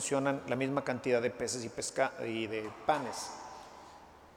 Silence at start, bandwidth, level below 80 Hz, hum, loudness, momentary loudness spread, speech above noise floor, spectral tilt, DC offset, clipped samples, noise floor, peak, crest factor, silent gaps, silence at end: 0 s; 17 kHz; -68 dBFS; none; -34 LUFS; 18 LU; 21 dB; -4 dB/octave; under 0.1%; under 0.1%; -55 dBFS; -14 dBFS; 20 dB; none; 0 s